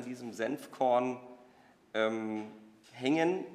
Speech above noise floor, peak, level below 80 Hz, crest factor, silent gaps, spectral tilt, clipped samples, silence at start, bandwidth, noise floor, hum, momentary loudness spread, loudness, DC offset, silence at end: 29 dB; -16 dBFS; -86 dBFS; 18 dB; none; -5.5 dB/octave; under 0.1%; 0 s; 15 kHz; -62 dBFS; none; 17 LU; -33 LUFS; under 0.1%; 0 s